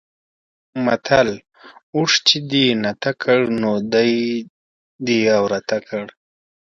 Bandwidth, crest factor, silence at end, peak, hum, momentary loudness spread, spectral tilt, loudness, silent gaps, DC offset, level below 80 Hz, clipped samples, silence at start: 7.8 kHz; 20 dB; 0.65 s; 0 dBFS; none; 13 LU; -4 dB/octave; -18 LUFS; 1.83-1.93 s, 4.50-4.99 s; under 0.1%; -58 dBFS; under 0.1%; 0.75 s